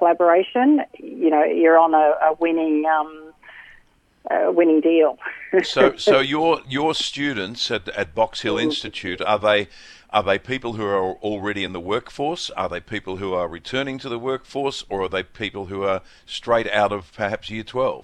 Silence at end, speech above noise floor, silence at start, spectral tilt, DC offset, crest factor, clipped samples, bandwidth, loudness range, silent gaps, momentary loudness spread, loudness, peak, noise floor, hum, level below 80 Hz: 0 s; 35 dB; 0 s; -5 dB/octave; under 0.1%; 20 dB; under 0.1%; 10.5 kHz; 7 LU; none; 11 LU; -21 LUFS; -2 dBFS; -55 dBFS; none; -54 dBFS